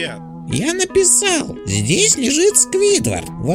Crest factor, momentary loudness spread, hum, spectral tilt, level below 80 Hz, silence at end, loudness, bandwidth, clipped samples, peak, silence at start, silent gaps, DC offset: 16 dB; 11 LU; none; -3 dB/octave; -42 dBFS; 0 s; -14 LUFS; 16.5 kHz; under 0.1%; 0 dBFS; 0 s; none; under 0.1%